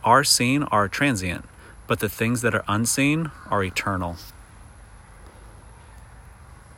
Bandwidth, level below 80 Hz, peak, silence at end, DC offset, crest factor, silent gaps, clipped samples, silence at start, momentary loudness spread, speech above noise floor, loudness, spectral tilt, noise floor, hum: 16.5 kHz; -48 dBFS; -4 dBFS; 0.05 s; under 0.1%; 20 dB; none; under 0.1%; 0 s; 12 LU; 24 dB; -22 LUFS; -4 dB/octave; -46 dBFS; none